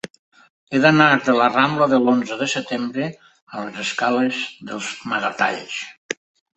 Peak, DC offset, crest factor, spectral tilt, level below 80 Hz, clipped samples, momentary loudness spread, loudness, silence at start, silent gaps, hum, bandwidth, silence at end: -2 dBFS; under 0.1%; 20 dB; -4.5 dB/octave; -64 dBFS; under 0.1%; 16 LU; -19 LUFS; 0.7 s; 3.42-3.47 s, 5.98-6.09 s; none; 8.4 kHz; 0.45 s